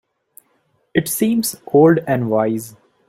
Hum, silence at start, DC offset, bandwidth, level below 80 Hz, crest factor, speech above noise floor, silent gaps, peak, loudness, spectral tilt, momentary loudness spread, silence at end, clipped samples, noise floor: none; 0.95 s; under 0.1%; 16.5 kHz; -58 dBFS; 16 dB; 47 dB; none; -2 dBFS; -17 LUFS; -5.5 dB/octave; 10 LU; 0.4 s; under 0.1%; -63 dBFS